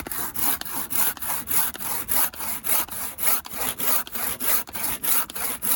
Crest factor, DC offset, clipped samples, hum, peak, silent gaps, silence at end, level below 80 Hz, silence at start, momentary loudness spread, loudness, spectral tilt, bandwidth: 20 dB; under 0.1%; under 0.1%; none; -4 dBFS; none; 0 s; -52 dBFS; 0 s; 6 LU; -22 LUFS; -0.5 dB/octave; over 20 kHz